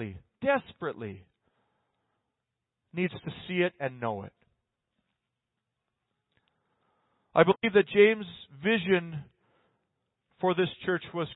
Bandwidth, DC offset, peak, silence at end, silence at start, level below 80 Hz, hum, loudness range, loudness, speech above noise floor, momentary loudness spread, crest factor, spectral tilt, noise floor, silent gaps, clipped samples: 4.1 kHz; under 0.1%; -8 dBFS; 0 s; 0 s; -68 dBFS; none; 10 LU; -28 LUFS; 58 dB; 19 LU; 24 dB; -10 dB/octave; -86 dBFS; none; under 0.1%